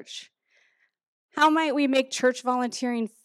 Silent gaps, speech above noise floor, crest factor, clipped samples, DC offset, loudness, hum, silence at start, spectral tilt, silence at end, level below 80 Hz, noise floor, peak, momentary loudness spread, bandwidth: 1.07-1.29 s; 44 dB; 18 dB; under 0.1%; under 0.1%; -24 LUFS; none; 0 s; -2.5 dB/octave; 0.15 s; -82 dBFS; -68 dBFS; -10 dBFS; 16 LU; 14 kHz